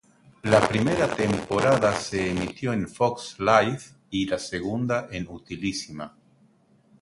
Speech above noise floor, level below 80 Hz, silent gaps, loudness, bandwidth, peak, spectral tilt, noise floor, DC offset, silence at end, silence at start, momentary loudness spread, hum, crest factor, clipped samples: 36 dB; -52 dBFS; none; -25 LUFS; 11.5 kHz; -2 dBFS; -5.5 dB/octave; -60 dBFS; under 0.1%; 0.95 s; 0.45 s; 14 LU; none; 22 dB; under 0.1%